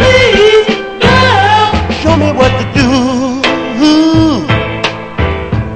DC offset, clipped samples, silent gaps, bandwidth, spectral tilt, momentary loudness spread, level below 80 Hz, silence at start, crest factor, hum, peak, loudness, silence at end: 0.8%; 0.6%; none; 9 kHz; -5.5 dB/octave; 9 LU; -26 dBFS; 0 s; 10 dB; none; 0 dBFS; -9 LUFS; 0 s